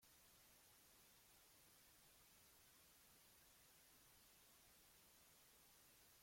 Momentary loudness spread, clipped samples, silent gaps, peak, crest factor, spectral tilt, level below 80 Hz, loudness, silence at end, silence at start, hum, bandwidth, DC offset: 0 LU; under 0.1%; none; -58 dBFS; 12 dB; -1.5 dB/octave; -86 dBFS; -69 LUFS; 0 s; 0 s; none; 16.5 kHz; under 0.1%